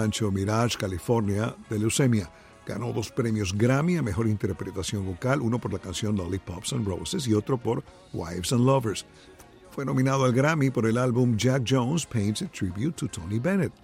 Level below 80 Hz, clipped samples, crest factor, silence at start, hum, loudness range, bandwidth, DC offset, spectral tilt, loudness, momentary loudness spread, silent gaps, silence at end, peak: -52 dBFS; under 0.1%; 16 dB; 0 s; none; 4 LU; 16 kHz; under 0.1%; -6 dB/octave; -26 LUFS; 9 LU; none; 0.15 s; -10 dBFS